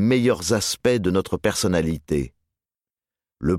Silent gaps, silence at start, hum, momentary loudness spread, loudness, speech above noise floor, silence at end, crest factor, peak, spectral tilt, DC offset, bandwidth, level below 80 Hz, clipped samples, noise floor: none; 0 s; none; 7 LU; -22 LUFS; over 69 dB; 0 s; 16 dB; -6 dBFS; -5 dB/octave; under 0.1%; 16 kHz; -44 dBFS; under 0.1%; under -90 dBFS